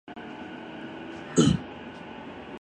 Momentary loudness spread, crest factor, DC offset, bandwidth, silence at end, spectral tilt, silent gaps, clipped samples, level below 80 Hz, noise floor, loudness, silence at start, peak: 18 LU; 22 dB; under 0.1%; 10.5 kHz; 0.05 s; -5.5 dB/octave; none; under 0.1%; -50 dBFS; -41 dBFS; -29 LUFS; 0.1 s; -8 dBFS